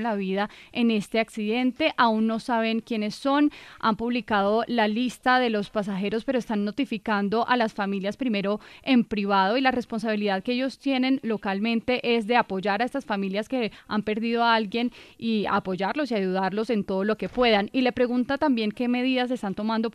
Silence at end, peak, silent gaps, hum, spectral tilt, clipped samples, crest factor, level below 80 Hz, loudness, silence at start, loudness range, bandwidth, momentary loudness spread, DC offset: 0.05 s; -6 dBFS; none; none; -6 dB/octave; under 0.1%; 18 dB; -58 dBFS; -25 LUFS; 0 s; 2 LU; 12.5 kHz; 6 LU; under 0.1%